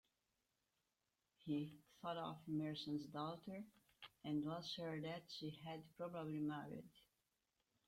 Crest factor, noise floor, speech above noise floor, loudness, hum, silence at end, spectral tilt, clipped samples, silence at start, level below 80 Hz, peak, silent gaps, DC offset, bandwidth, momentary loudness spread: 16 dB; -90 dBFS; 42 dB; -49 LUFS; none; 0.85 s; -6.5 dB/octave; under 0.1%; 1.45 s; -84 dBFS; -34 dBFS; none; under 0.1%; 16 kHz; 11 LU